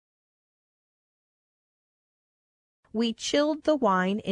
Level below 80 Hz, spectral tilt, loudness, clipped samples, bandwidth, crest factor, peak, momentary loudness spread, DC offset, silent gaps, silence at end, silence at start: -68 dBFS; -4.5 dB/octave; -26 LUFS; under 0.1%; 11 kHz; 20 dB; -12 dBFS; 6 LU; under 0.1%; none; 0 s; 2.95 s